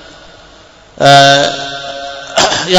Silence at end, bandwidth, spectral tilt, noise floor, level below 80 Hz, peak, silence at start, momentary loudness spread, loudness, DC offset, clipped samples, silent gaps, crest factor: 0 s; 11 kHz; -3 dB/octave; -39 dBFS; -44 dBFS; 0 dBFS; 1 s; 17 LU; -9 LUFS; under 0.1%; 2%; none; 12 dB